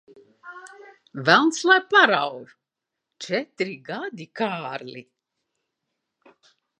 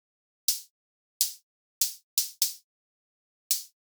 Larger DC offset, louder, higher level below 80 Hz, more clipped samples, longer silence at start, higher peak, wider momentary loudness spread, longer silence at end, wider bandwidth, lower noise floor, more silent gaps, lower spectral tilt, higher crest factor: neither; first, -21 LUFS vs -29 LUFS; first, -82 dBFS vs under -90 dBFS; neither; about the same, 0.45 s vs 0.5 s; first, 0 dBFS vs -6 dBFS; first, 25 LU vs 6 LU; first, 1.8 s vs 0.2 s; second, 11 kHz vs over 20 kHz; second, -85 dBFS vs under -90 dBFS; second, none vs 0.70-1.20 s, 1.43-1.81 s, 2.03-2.17 s, 2.64-3.50 s; first, -3.5 dB/octave vs 11.5 dB/octave; about the same, 24 dB vs 28 dB